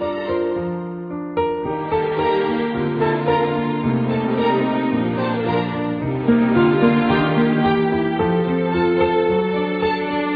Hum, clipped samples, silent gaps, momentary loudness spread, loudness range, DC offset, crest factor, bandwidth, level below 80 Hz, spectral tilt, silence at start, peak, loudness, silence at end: none; under 0.1%; none; 7 LU; 4 LU; under 0.1%; 16 dB; 5 kHz; -46 dBFS; -10 dB/octave; 0 s; -4 dBFS; -19 LUFS; 0 s